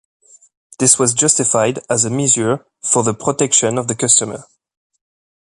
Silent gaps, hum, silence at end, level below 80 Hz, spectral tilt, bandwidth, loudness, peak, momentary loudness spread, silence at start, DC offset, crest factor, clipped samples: none; none; 1.05 s; -56 dBFS; -3 dB/octave; 13 kHz; -14 LUFS; 0 dBFS; 7 LU; 0.8 s; under 0.1%; 18 dB; under 0.1%